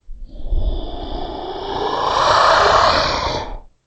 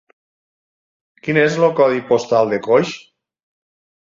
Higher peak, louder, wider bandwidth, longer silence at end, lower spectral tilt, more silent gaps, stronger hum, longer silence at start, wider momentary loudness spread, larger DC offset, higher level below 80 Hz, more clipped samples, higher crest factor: about the same, 0 dBFS vs -2 dBFS; about the same, -16 LUFS vs -16 LUFS; first, 8.6 kHz vs 7.6 kHz; second, 0.25 s vs 1.05 s; second, -3.5 dB/octave vs -6 dB/octave; neither; neither; second, 0.1 s vs 1.25 s; first, 17 LU vs 12 LU; neither; first, -26 dBFS vs -62 dBFS; neither; about the same, 18 dB vs 18 dB